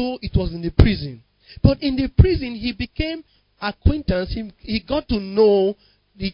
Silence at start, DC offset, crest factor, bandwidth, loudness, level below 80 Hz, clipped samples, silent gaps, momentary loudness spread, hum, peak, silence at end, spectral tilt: 0 s; under 0.1%; 20 dB; 5.4 kHz; -21 LUFS; -26 dBFS; under 0.1%; none; 12 LU; none; 0 dBFS; 0 s; -10 dB/octave